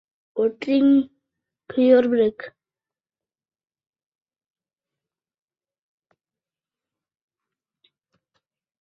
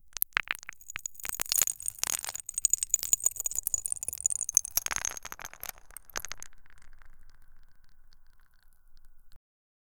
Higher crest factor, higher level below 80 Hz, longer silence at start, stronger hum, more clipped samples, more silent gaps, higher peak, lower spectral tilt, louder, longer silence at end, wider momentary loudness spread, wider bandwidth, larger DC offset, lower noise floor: second, 22 dB vs 32 dB; second, -70 dBFS vs -56 dBFS; first, 0.35 s vs 0.05 s; neither; neither; neither; about the same, -4 dBFS vs -2 dBFS; first, -7.5 dB/octave vs 2 dB/octave; first, -20 LUFS vs -30 LUFS; first, 6.3 s vs 0.65 s; about the same, 18 LU vs 16 LU; second, 5.6 kHz vs over 20 kHz; neither; first, under -90 dBFS vs -56 dBFS